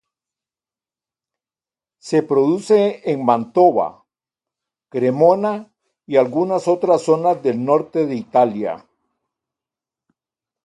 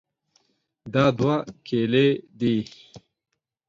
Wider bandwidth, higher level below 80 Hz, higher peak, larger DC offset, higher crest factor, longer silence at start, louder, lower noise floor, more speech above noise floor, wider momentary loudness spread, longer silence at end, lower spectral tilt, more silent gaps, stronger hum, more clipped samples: first, 11.5 kHz vs 7.6 kHz; second, -68 dBFS vs -60 dBFS; first, -2 dBFS vs -6 dBFS; neither; about the same, 18 dB vs 18 dB; first, 2.05 s vs 0.85 s; first, -17 LUFS vs -23 LUFS; first, under -90 dBFS vs -67 dBFS; first, over 73 dB vs 45 dB; about the same, 9 LU vs 8 LU; first, 1.85 s vs 0.7 s; about the same, -7 dB/octave vs -7.5 dB/octave; neither; neither; neither